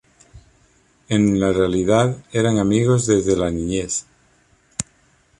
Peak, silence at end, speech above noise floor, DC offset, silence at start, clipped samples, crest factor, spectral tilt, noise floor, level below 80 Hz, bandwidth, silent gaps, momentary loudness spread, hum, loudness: -2 dBFS; 0.6 s; 40 dB; under 0.1%; 0.35 s; under 0.1%; 18 dB; -5.5 dB/octave; -58 dBFS; -44 dBFS; 11.5 kHz; none; 12 LU; none; -19 LUFS